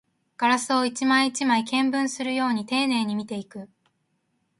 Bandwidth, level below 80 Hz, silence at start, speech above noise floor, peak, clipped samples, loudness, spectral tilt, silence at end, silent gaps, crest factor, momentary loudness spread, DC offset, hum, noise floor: 11.5 kHz; -72 dBFS; 0.4 s; 49 dB; -6 dBFS; under 0.1%; -23 LUFS; -3 dB/octave; 0.95 s; none; 18 dB; 12 LU; under 0.1%; none; -73 dBFS